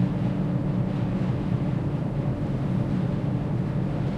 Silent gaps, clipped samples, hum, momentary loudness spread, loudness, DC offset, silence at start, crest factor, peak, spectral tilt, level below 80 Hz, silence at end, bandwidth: none; under 0.1%; none; 2 LU; -27 LUFS; under 0.1%; 0 s; 12 dB; -12 dBFS; -9.5 dB/octave; -42 dBFS; 0 s; 7.4 kHz